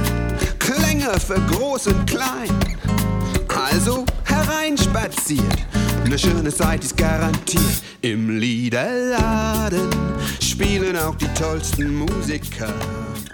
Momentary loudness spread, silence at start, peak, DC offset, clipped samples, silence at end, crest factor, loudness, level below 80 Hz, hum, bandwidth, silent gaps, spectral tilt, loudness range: 5 LU; 0 s; -2 dBFS; under 0.1%; under 0.1%; 0 s; 16 dB; -20 LUFS; -28 dBFS; none; 19 kHz; none; -4.5 dB/octave; 1 LU